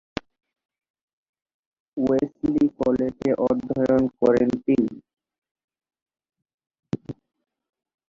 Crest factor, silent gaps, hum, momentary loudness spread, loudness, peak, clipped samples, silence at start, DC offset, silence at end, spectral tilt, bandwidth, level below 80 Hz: 20 dB; 5.38-5.42 s, 5.51-5.55 s, 5.64-5.68 s, 6.02-6.06 s, 6.54-6.58 s, 6.79-6.83 s; none; 17 LU; -23 LUFS; -6 dBFS; under 0.1%; 1.95 s; under 0.1%; 0.95 s; -8.5 dB/octave; 7.2 kHz; -56 dBFS